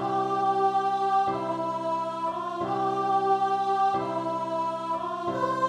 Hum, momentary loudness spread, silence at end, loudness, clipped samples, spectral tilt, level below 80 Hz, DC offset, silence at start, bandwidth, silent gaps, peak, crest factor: none; 6 LU; 0 s; -27 LUFS; under 0.1%; -6 dB/octave; -68 dBFS; under 0.1%; 0 s; 10.5 kHz; none; -14 dBFS; 12 dB